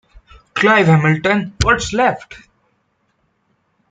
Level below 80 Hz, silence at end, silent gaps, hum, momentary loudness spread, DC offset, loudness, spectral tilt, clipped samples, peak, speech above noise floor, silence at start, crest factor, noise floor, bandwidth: -38 dBFS; 1.55 s; none; none; 8 LU; under 0.1%; -14 LUFS; -5.5 dB/octave; under 0.1%; 0 dBFS; 50 dB; 0.55 s; 18 dB; -64 dBFS; 9.2 kHz